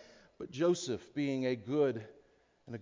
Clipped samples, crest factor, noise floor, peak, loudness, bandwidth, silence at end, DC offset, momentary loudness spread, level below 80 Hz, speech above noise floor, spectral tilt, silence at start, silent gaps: under 0.1%; 16 dB; -67 dBFS; -20 dBFS; -34 LUFS; 7.6 kHz; 0 s; under 0.1%; 16 LU; -72 dBFS; 33 dB; -5.5 dB/octave; 0 s; none